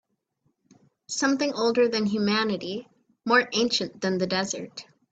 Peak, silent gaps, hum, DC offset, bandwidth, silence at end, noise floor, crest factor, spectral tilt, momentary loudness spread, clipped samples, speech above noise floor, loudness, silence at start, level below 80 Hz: -8 dBFS; none; none; under 0.1%; 9 kHz; 0.3 s; -73 dBFS; 20 dB; -3.5 dB/octave; 13 LU; under 0.1%; 48 dB; -25 LUFS; 1.1 s; -68 dBFS